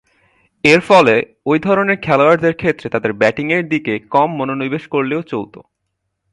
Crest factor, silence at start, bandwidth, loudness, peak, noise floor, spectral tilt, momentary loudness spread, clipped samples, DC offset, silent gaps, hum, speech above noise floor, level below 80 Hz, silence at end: 16 dB; 0.65 s; 11.5 kHz; -15 LUFS; 0 dBFS; -73 dBFS; -6 dB/octave; 10 LU; under 0.1%; under 0.1%; none; none; 58 dB; -54 dBFS; 0.75 s